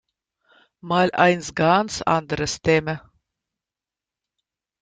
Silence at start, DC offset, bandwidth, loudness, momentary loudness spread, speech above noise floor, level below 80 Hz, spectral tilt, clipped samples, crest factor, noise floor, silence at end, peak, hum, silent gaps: 0.85 s; under 0.1%; 9.4 kHz; -20 LUFS; 8 LU; 69 dB; -52 dBFS; -5 dB/octave; under 0.1%; 20 dB; -89 dBFS; 1.8 s; -2 dBFS; none; none